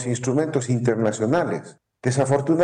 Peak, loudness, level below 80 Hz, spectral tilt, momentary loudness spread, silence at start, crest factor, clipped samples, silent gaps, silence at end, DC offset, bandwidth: -10 dBFS; -22 LUFS; -60 dBFS; -6.5 dB/octave; 7 LU; 0 s; 12 dB; under 0.1%; none; 0 s; under 0.1%; 10.5 kHz